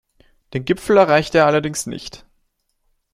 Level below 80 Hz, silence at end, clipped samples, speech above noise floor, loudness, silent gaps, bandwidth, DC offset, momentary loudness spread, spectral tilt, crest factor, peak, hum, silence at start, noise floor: -50 dBFS; 0.95 s; under 0.1%; 51 dB; -17 LUFS; none; 14.5 kHz; under 0.1%; 17 LU; -5 dB/octave; 18 dB; -2 dBFS; none; 0.55 s; -67 dBFS